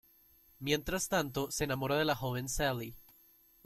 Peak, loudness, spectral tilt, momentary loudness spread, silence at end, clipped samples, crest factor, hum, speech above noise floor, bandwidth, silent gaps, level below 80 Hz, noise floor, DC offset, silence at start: -16 dBFS; -34 LUFS; -4 dB/octave; 7 LU; 0.65 s; under 0.1%; 20 dB; none; 31 dB; 16.5 kHz; none; -54 dBFS; -65 dBFS; under 0.1%; 0.6 s